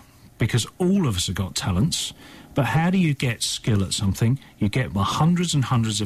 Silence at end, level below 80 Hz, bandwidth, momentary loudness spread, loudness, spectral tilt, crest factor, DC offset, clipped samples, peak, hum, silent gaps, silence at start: 0 s; -44 dBFS; 15 kHz; 5 LU; -23 LUFS; -5 dB/octave; 12 dB; under 0.1%; under 0.1%; -10 dBFS; none; none; 0.4 s